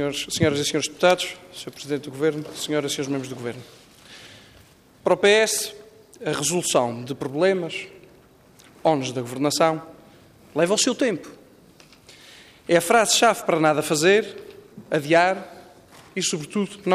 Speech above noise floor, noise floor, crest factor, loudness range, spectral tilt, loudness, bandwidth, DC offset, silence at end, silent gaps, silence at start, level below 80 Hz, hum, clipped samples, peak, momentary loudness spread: 31 dB; -53 dBFS; 18 dB; 6 LU; -3.5 dB/octave; -22 LUFS; 15.5 kHz; under 0.1%; 0 s; none; 0 s; -62 dBFS; none; under 0.1%; -4 dBFS; 16 LU